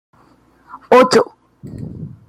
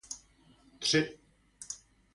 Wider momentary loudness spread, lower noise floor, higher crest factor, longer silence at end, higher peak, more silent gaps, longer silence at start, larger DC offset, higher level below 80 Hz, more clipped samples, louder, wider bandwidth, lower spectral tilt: first, 22 LU vs 17 LU; second, -52 dBFS vs -63 dBFS; second, 16 dB vs 22 dB; second, 0.2 s vs 0.4 s; first, 0 dBFS vs -14 dBFS; neither; first, 0.75 s vs 0.1 s; neither; first, -52 dBFS vs -68 dBFS; neither; first, -13 LUFS vs -32 LUFS; first, 14.5 kHz vs 11.5 kHz; first, -4.5 dB/octave vs -3 dB/octave